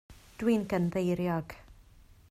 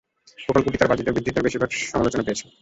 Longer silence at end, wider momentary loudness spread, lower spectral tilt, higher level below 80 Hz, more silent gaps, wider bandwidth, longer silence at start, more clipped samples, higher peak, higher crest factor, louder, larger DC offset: first, 0.55 s vs 0.2 s; first, 14 LU vs 6 LU; first, -7.5 dB/octave vs -5 dB/octave; second, -56 dBFS vs -44 dBFS; neither; first, 14.5 kHz vs 8.2 kHz; second, 0.1 s vs 0.4 s; neither; second, -16 dBFS vs -2 dBFS; about the same, 16 dB vs 20 dB; second, -31 LUFS vs -22 LUFS; neither